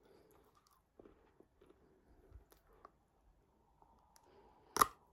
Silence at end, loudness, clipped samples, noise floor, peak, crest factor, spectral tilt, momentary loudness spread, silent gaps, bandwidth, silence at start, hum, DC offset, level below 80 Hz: 0.25 s; -37 LUFS; under 0.1%; -74 dBFS; -12 dBFS; 36 dB; -1.5 dB/octave; 30 LU; none; 16 kHz; 4.75 s; none; under 0.1%; -70 dBFS